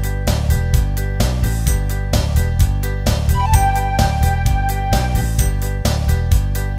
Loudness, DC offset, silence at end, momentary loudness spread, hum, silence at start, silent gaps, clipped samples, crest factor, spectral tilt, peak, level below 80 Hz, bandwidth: -18 LUFS; under 0.1%; 0 s; 4 LU; none; 0 s; none; under 0.1%; 16 dB; -5 dB/octave; 0 dBFS; -18 dBFS; 16.5 kHz